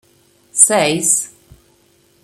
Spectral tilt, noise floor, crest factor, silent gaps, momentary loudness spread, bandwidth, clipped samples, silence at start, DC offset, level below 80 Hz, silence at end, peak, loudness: -2 dB/octave; -55 dBFS; 18 dB; none; 13 LU; 16.5 kHz; under 0.1%; 0.55 s; under 0.1%; -58 dBFS; 0.95 s; 0 dBFS; -13 LUFS